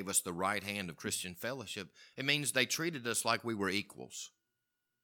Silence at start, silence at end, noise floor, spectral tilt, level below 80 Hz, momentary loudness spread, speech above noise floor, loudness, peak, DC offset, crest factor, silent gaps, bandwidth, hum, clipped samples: 0 s; 0.75 s; -86 dBFS; -2.5 dB/octave; -76 dBFS; 14 LU; 49 dB; -35 LUFS; -14 dBFS; under 0.1%; 24 dB; none; 19 kHz; none; under 0.1%